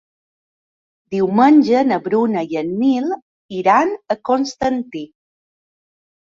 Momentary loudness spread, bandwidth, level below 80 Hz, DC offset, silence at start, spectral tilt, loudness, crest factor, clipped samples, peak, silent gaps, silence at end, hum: 17 LU; 7.4 kHz; -56 dBFS; under 0.1%; 1.1 s; -6.5 dB/octave; -17 LUFS; 16 dB; under 0.1%; -2 dBFS; 3.22-3.49 s; 1.25 s; none